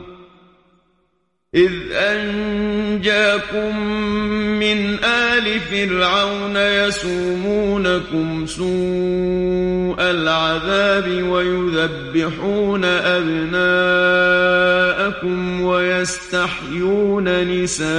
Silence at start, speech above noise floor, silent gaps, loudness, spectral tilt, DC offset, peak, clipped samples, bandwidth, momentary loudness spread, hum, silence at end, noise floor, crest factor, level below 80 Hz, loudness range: 0 s; 50 dB; none; -17 LUFS; -4.5 dB/octave; under 0.1%; -2 dBFS; under 0.1%; 11 kHz; 7 LU; none; 0 s; -67 dBFS; 16 dB; -42 dBFS; 3 LU